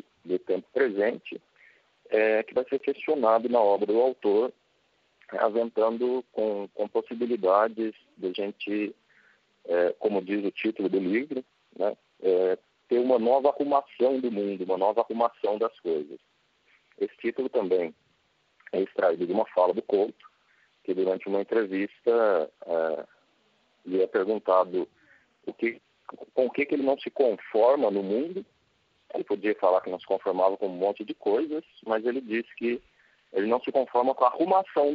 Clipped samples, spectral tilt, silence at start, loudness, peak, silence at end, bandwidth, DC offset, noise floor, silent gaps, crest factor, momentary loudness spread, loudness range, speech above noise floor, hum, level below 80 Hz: under 0.1%; -4 dB/octave; 0.25 s; -27 LUFS; -8 dBFS; 0 s; 5.2 kHz; under 0.1%; -69 dBFS; none; 20 dB; 11 LU; 4 LU; 43 dB; none; -80 dBFS